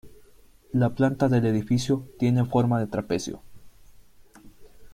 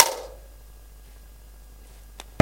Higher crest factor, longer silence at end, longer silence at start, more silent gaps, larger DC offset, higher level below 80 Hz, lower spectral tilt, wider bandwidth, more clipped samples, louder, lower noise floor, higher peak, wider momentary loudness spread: second, 18 dB vs 26 dB; about the same, 0 s vs 0 s; about the same, 0.05 s vs 0 s; neither; neither; second, -52 dBFS vs -46 dBFS; first, -7 dB/octave vs -4.5 dB/octave; second, 14.5 kHz vs 17 kHz; neither; about the same, -25 LUFS vs -23 LUFS; first, -53 dBFS vs -46 dBFS; second, -8 dBFS vs 0 dBFS; second, 8 LU vs 12 LU